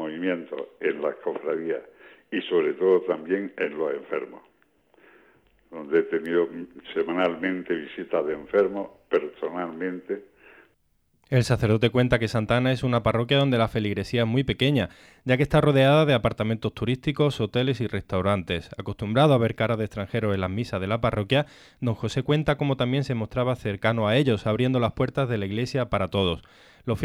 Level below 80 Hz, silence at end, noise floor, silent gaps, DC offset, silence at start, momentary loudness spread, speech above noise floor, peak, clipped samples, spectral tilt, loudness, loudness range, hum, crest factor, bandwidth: -50 dBFS; 0 s; -69 dBFS; none; under 0.1%; 0 s; 10 LU; 44 dB; -8 dBFS; under 0.1%; -7 dB/octave; -25 LUFS; 6 LU; none; 18 dB; 14 kHz